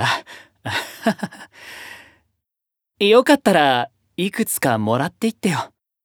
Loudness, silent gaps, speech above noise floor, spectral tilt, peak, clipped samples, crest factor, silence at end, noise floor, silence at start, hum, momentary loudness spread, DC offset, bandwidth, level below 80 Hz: -19 LUFS; none; 67 dB; -4.5 dB/octave; 0 dBFS; under 0.1%; 20 dB; 0.35 s; -84 dBFS; 0 s; none; 21 LU; under 0.1%; 20 kHz; -64 dBFS